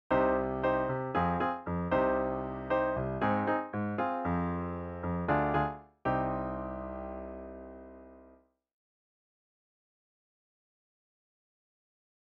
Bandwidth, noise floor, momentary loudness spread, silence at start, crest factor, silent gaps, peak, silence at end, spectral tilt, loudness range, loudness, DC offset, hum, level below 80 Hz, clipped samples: 5.6 kHz; -62 dBFS; 13 LU; 0.1 s; 18 dB; none; -16 dBFS; 4.05 s; -9.5 dB/octave; 15 LU; -32 LUFS; under 0.1%; none; -52 dBFS; under 0.1%